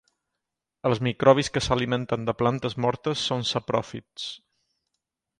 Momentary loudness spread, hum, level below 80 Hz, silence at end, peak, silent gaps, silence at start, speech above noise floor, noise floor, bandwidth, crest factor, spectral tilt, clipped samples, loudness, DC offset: 15 LU; none; -52 dBFS; 1 s; -4 dBFS; none; 0.85 s; 60 dB; -85 dBFS; 11 kHz; 22 dB; -5 dB/octave; under 0.1%; -25 LUFS; under 0.1%